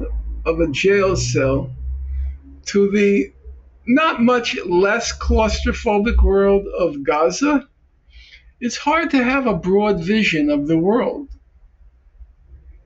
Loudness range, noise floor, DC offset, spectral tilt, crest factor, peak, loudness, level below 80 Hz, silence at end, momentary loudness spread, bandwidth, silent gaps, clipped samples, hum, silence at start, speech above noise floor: 2 LU; -49 dBFS; under 0.1%; -5.5 dB/octave; 12 dB; -6 dBFS; -18 LUFS; -28 dBFS; 0.15 s; 13 LU; 8 kHz; none; under 0.1%; none; 0 s; 33 dB